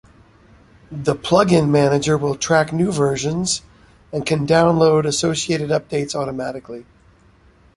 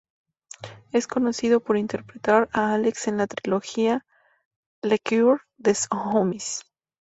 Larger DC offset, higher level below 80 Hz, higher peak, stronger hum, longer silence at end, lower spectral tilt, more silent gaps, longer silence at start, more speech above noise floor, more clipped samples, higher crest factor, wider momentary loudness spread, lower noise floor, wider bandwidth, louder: neither; first, -48 dBFS vs -64 dBFS; about the same, -2 dBFS vs -4 dBFS; neither; first, 0.95 s vs 0.4 s; about the same, -5 dB/octave vs -4.5 dB/octave; second, none vs 4.45-4.82 s; first, 0.9 s vs 0.6 s; first, 34 dB vs 20 dB; neither; about the same, 18 dB vs 20 dB; about the same, 13 LU vs 11 LU; first, -52 dBFS vs -43 dBFS; first, 11.5 kHz vs 8.2 kHz; first, -18 LUFS vs -24 LUFS